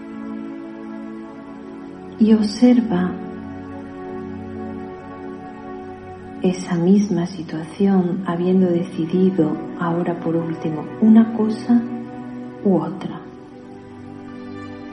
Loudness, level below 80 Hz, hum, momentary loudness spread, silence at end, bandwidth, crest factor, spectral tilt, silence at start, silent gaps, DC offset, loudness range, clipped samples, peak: -19 LUFS; -58 dBFS; none; 20 LU; 0 s; 10 kHz; 18 dB; -8 dB/octave; 0 s; none; under 0.1%; 8 LU; under 0.1%; -2 dBFS